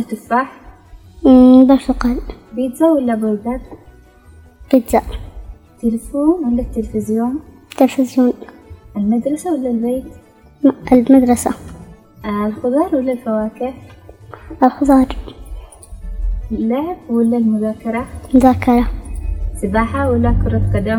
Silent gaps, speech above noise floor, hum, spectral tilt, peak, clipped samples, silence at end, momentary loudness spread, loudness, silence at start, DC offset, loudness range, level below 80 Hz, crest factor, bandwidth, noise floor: none; 29 dB; none; -7.5 dB/octave; 0 dBFS; under 0.1%; 0 s; 17 LU; -15 LUFS; 0 s; under 0.1%; 6 LU; -30 dBFS; 16 dB; 17 kHz; -43 dBFS